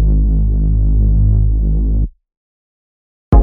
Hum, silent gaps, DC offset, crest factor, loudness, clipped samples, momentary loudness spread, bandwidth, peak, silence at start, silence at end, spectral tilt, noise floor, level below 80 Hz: 50 Hz at -35 dBFS; 2.37-3.32 s; under 0.1%; 12 dB; -15 LUFS; under 0.1%; 5 LU; 1.7 kHz; 0 dBFS; 0 s; 0 s; -12.5 dB/octave; under -90 dBFS; -14 dBFS